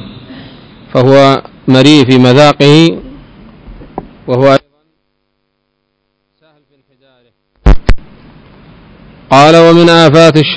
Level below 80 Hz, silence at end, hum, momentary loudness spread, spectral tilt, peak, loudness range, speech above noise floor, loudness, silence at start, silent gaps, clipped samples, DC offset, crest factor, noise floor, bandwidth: -22 dBFS; 0 s; none; 20 LU; -6 dB/octave; 0 dBFS; 12 LU; 59 dB; -6 LUFS; 0.05 s; none; 8%; under 0.1%; 8 dB; -64 dBFS; 8 kHz